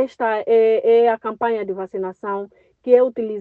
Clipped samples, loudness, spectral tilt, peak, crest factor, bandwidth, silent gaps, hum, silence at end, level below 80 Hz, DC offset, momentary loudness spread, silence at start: under 0.1%; -19 LUFS; -7 dB/octave; -2 dBFS; 16 dB; 4.3 kHz; none; none; 0 s; -68 dBFS; under 0.1%; 12 LU; 0 s